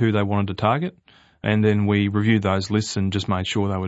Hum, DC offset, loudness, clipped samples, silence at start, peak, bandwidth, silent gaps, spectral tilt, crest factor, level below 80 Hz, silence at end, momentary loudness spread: none; under 0.1%; -22 LUFS; under 0.1%; 0 s; -4 dBFS; 8 kHz; none; -6.5 dB/octave; 18 dB; -54 dBFS; 0 s; 5 LU